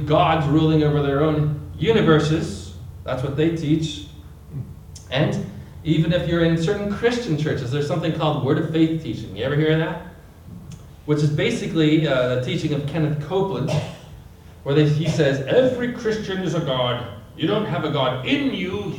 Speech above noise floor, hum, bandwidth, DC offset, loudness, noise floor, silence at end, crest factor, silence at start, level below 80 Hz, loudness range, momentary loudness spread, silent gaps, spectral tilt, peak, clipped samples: 22 dB; none; 10.5 kHz; under 0.1%; -21 LUFS; -42 dBFS; 0 s; 18 dB; 0 s; -46 dBFS; 3 LU; 17 LU; none; -7 dB/octave; -4 dBFS; under 0.1%